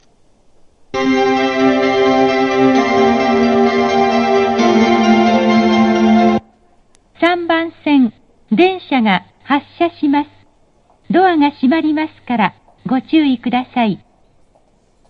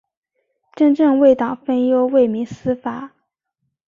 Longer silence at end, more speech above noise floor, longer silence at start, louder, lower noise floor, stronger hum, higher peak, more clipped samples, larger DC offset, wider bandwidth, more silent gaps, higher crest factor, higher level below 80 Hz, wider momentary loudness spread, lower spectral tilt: first, 1.15 s vs 0.8 s; second, 38 dB vs 59 dB; first, 0.95 s vs 0.75 s; about the same, -14 LUFS vs -16 LUFS; second, -53 dBFS vs -75 dBFS; neither; about the same, 0 dBFS vs -2 dBFS; neither; neither; about the same, 7 kHz vs 7.2 kHz; neither; about the same, 14 dB vs 16 dB; first, -48 dBFS vs -58 dBFS; second, 7 LU vs 11 LU; second, -6 dB/octave vs -8 dB/octave